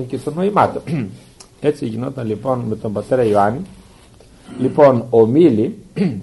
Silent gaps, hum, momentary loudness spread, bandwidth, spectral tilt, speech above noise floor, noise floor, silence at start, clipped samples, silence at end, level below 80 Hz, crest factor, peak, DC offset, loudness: none; none; 12 LU; 11.5 kHz; -8 dB/octave; 29 dB; -45 dBFS; 0 s; under 0.1%; 0 s; -50 dBFS; 16 dB; 0 dBFS; under 0.1%; -17 LUFS